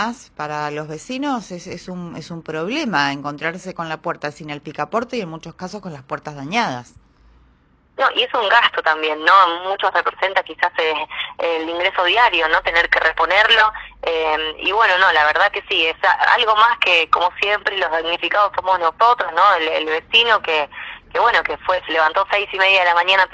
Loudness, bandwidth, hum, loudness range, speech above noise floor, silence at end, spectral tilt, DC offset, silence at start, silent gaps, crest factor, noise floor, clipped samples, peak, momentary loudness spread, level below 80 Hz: -16 LUFS; 9.6 kHz; none; 10 LU; 37 dB; 0.05 s; -3.5 dB/octave; under 0.1%; 0 s; none; 18 dB; -55 dBFS; under 0.1%; 0 dBFS; 16 LU; -52 dBFS